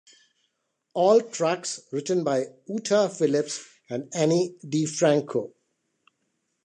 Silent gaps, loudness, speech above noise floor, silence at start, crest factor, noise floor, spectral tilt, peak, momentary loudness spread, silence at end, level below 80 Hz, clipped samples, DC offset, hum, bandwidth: none; -25 LUFS; 52 dB; 0.95 s; 18 dB; -77 dBFS; -5 dB/octave; -8 dBFS; 12 LU; 1.15 s; -78 dBFS; under 0.1%; under 0.1%; none; 10 kHz